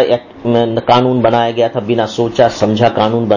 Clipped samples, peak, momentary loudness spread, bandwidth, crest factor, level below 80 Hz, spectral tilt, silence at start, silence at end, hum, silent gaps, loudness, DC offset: under 0.1%; 0 dBFS; 5 LU; 7.4 kHz; 12 dB; -46 dBFS; -6.5 dB/octave; 0 s; 0 s; none; none; -13 LUFS; under 0.1%